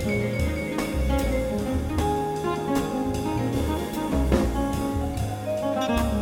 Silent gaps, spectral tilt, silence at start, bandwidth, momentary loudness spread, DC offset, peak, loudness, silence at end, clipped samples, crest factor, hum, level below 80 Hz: none; -6.5 dB/octave; 0 s; 17.5 kHz; 4 LU; under 0.1%; -8 dBFS; -26 LUFS; 0 s; under 0.1%; 16 dB; none; -32 dBFS